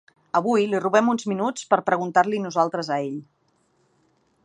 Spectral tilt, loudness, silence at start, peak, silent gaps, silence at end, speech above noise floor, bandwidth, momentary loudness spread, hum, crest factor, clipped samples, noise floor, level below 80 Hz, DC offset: -5.5 dB/octave; -22 LUFS; 0.35 s; -2 dBFS; none; 1.2 s; 44 dB; 10 kHz; 7 LU; none; 20 dB; under 0.1%; -66 dBFS; -76 dBFS; under 0.1%